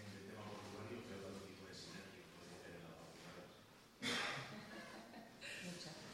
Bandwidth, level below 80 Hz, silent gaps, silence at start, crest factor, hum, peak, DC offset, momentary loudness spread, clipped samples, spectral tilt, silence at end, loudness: 16 kHz; -78 dBFS; none; 0 s; 22 dB; none; -30 dBFS; under 0.1%; 15 LU; under 0.1%; -3.5 dB/octave; 0 s; -51 LUFS